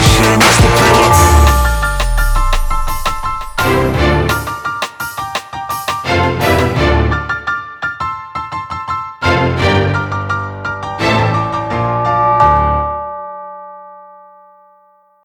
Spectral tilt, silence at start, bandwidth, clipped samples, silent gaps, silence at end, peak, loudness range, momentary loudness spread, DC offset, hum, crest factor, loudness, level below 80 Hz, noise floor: -4.5 dB/octave; 0 s; 19.5 kHz; under 0.1%; none; 1.15 s; 0 dBFS; 5 LU; 14 LU; under 0.1%; none; 14 dB; -13 LUFS; -20 dBFS; -50 dBFS